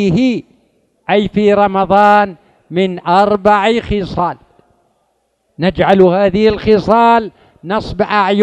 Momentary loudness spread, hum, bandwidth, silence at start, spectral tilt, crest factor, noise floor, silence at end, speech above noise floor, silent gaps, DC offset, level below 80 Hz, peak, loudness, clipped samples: 11 LU; none; 8.8 kHz; 0 s; -7 dB/octave; 12 dB; -62 dBFS; 0 s; 51 dB; none; under 0.1%; -38 dBFS; 0 dBFS; -12 LUFS; 0.3%